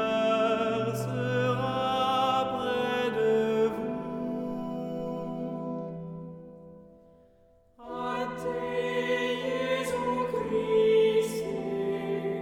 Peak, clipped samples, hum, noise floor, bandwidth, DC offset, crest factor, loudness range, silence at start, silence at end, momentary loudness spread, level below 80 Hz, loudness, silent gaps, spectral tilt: -14 dBFS; under 0.1%; none; -61 dBFS; 16.5 kHz; under 0.1%; 14 dB; 10 LU; 0 s; 0 s; 10 LU; -60 dBFS; -29 LUFS; none; -5.5 dB/octave